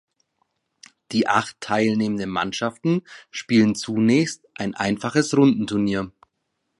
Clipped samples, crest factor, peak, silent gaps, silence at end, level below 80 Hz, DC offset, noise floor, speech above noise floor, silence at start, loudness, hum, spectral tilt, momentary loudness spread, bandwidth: under 0.1%; 18 dB; -4 dBFS; none; 0.7 s; -58 dBFS; under 0.1%; -76 dBFS; 54 dB; 1.1 s; -22 LUFS; none; -5.5 dB/octave; 10 LU; 11.5 kHz